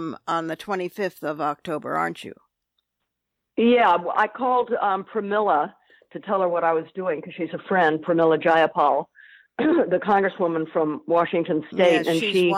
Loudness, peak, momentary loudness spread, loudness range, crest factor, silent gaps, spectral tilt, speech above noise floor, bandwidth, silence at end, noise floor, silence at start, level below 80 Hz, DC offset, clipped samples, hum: -22 LUFS; -6 dBFS; 11 LU; 4 LU; 18 dB; none; -6 dB/octave; 59 dB; 15.5 kHz; 0 s; -81 dBFS; 0 s; -70 dBFS; under 0.1%; under 0.1%; none